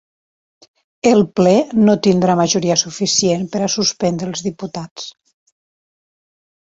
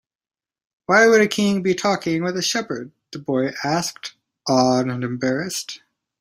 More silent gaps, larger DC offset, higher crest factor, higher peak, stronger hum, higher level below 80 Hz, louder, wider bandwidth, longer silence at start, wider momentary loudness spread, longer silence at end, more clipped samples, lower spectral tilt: first, 4.91-4.96 s vs none; neither; about the same, 18 dB vs 20 dB; about the same, 0 dBFS vs -2 dBFS; neither; first, -56 dBFS vs -62 dBFS; first, -15 LUFS vs -20 LUFS; second, 8 kHz vs 16 kHz; first, 1.05 s vs 0.9 s; second, 14 LU vs 19 LU; first, 1.55 s vs 0.45 s; neither; about the same, -4.5 dB/octave vs -4 dB/octave